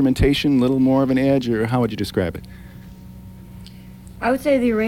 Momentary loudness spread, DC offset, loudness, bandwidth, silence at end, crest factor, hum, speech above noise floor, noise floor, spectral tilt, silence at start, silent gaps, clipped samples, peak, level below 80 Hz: 23 LU; 0.1%; -19 LUFS; 16.5 kHz; 0 s; 14 dB; none; 21 dB; -39 dBFS; -7 dB/octave; 0 s; none; under 0.1%; -4 dBFS; -36 dBFS